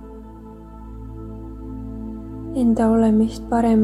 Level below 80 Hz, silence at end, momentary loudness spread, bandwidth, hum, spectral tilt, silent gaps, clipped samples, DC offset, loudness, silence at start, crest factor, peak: -38 dBFS; 0 s; 23 LU; 11 kHz; none; -8 dB/octave; none; under 0.1%; under 0.1%; -19 LUFS; 0 s; 14 dB; -6 dBFS